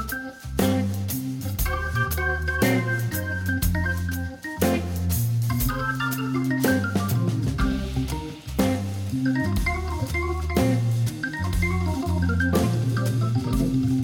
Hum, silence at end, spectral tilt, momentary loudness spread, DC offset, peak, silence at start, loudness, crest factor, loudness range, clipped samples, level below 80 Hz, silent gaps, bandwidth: none; 0 s; -6 dB/octave; 6 LU; under 0.1%; -10 dBFS; 0 s; -25 LUFS; 14 dB; 1 LU; under 0.1%; -34 dBFS; none; 17.5 kHz